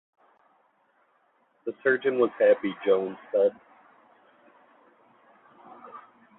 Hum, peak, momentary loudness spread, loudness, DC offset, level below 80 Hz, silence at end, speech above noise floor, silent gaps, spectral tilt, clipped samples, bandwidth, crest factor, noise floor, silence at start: none; -10 dBFS; 24 LU; -25 LUFS; under 0.1%; -78 dBFS; 0.4 s; 43 dB; none; -9 dB/octave; under 0.1%; 4 kHz; 20 dB; -67 dBFS; 1.65 s